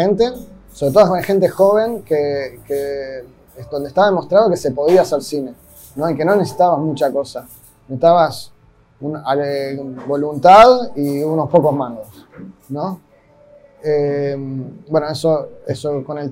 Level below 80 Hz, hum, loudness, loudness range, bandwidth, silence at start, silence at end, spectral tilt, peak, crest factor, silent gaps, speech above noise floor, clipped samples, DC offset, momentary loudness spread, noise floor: -50 dBFS; none; -16 LUFS; 7 LU; 16 kHz; 0 s; 0 s; -6.5 dB/octave; 0 dBFS; 16 dB; none; 33 dB; under 0.1%; under 0.1%; 15 LU; -48 dBFS